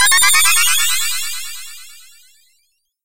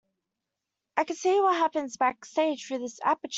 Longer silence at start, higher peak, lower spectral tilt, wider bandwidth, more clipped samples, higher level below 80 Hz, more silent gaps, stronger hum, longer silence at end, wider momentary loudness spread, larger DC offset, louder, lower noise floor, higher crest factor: second, 0 s vs 0.95 s; first, 0 dBFS vs -10 dBFS; second, 4 dB/octave vs -2 dB/octave; first, 16 kHz vs 8 kHz; neither; first, -54 dBFS vs -78 dBFS; neither; neither; about the same, 0 s vs 0 s; first, 20 LU vs 9 LU; neither; first, -12 LUFS vs -27 LUFS; second, -64 dBFS vs -86 dBFS; about the same, 16 dB vs 18 dB